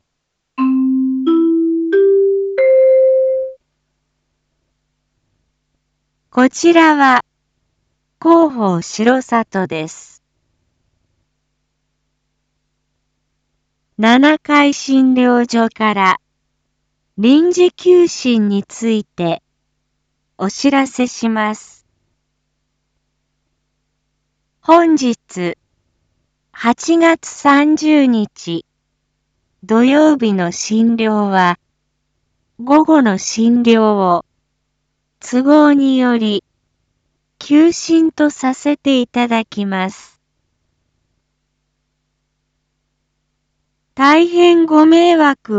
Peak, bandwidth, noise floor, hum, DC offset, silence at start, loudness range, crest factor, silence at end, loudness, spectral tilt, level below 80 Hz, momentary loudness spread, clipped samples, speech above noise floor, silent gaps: 0 dBFS; 8 kHz; -73 dBFS; none; under 0.1%; 0.6 s; 7 LU; 14 dB; 0 s; -13 LUFS; -5 dB/octave; -62 dBFS; 12 LU; under 0.1%; 61 dB; none